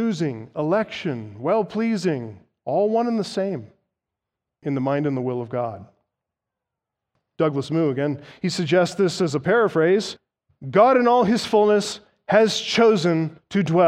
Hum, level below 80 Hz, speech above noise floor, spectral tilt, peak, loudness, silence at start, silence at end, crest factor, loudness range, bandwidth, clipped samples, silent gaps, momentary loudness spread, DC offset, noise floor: none; -66 dBFS; 65 dB; -6 dB/octave; -4 dBFS; -21 LUFS; 0 s; 0 s; 18 dB; 9 LU; 12.5 kHz; under 0.1%; none; 13 LU; under 0.1%; -85 dBFS